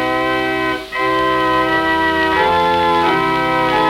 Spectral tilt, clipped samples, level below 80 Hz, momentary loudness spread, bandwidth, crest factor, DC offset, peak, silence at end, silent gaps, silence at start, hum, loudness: -5 dB/octave; under 0.1%; -40 dBFS; 4 LU; 16.5 kHz; 14 dB; under 0.1%; -2 dBFS; 0 s; none; 0 s; none; -15 LUFS